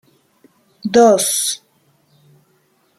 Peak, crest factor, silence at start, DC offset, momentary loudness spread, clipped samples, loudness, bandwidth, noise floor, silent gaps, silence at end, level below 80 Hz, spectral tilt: -2 dBFS; 18 dB; 0.85 s; under 0.1%; 17 LU; under 0.1%; -14 LUFS; 15 kHz; -59 dBFS; none; 1.45 s; -62 dBFS; -2.5 dB/octave